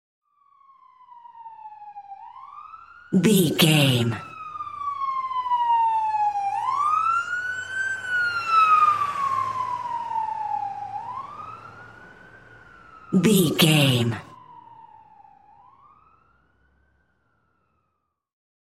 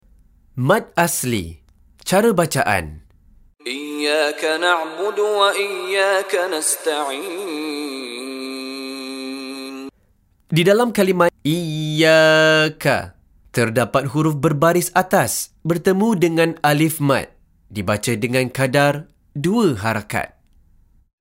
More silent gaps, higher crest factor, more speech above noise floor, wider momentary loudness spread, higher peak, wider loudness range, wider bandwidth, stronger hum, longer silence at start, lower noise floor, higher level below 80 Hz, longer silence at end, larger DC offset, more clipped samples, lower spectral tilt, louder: neither; about the same, 20 dB vs 16 dB; first, 58 dB vs 41 dB; first, 25 LU vs 13 LU; about the same, -4 dBFS vs -2 dBFS; about the same, 8 LU vs 6 LU; about the same, 16 kHz vs 16 kHz; neither; first, 1.15 s vs 0.55 s; first, -76 dBFS vs -59 dBFS; second, -66 dBFS vs -52 dBFS; first, 3.9 s vs 0.95 s; neither; neither; about the same, -4.5 dB/octave vs -4.5 dB/octave; second, -22 LUFS vs -18 LUFS